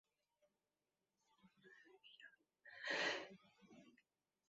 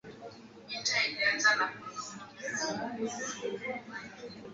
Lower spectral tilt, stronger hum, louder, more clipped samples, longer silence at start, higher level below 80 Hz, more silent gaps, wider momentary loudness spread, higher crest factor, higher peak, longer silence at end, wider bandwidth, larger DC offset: about the same, 0.5 dB/octave vs 0 dB/octave; neither; second, -44 LUFS vs -32 LUFS; neither; first, 1.45 s vs 0.05 s; second, under -90 dBFS vs -74 dBFS; neither; first, 26 LU vs 20 LU; about the same, 24 dB vs 22 dB; second, -28 dBFS vs -14 dBFS; first, 0.6 s vs 0 s; about the same, 7.6 kHz vs 8 kHz; neither